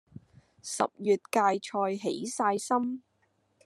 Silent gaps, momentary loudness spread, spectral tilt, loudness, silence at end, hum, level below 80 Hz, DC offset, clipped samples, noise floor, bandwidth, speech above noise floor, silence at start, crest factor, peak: none; 10 LU; -4 dB/octave; -29 LUFS; 0.65 s; none; -78 dBFS; under 0.1%; under 0.1%; -72 dBFS; 13 kHz; 43 dB; 0.65 s; 20 dB; -10 dBFS